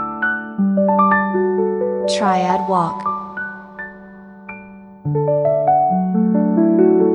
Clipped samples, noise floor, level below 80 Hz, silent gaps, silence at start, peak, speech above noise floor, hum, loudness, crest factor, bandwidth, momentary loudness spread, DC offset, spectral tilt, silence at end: under 0.1%; -38 dBFS; -56 dBFS; none; 0 s; -2 dBFS; 21 dB; none; -17 LUFS; 14 dB; 10.5 kHz; 18 LU; under 0.1%; -7 dB/octave; 0 s